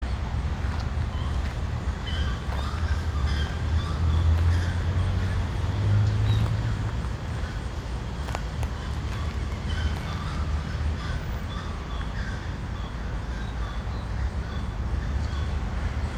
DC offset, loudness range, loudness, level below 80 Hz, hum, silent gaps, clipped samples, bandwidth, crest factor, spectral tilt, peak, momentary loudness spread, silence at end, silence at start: under 0.1%; 7 LU; -29 LUFS; -32 dBFS; none; none; under 0.1%; 10 kHz; 16 dB; -6.5 dB/octave; -12 dBFS; 9 LU; 0 s; 0 s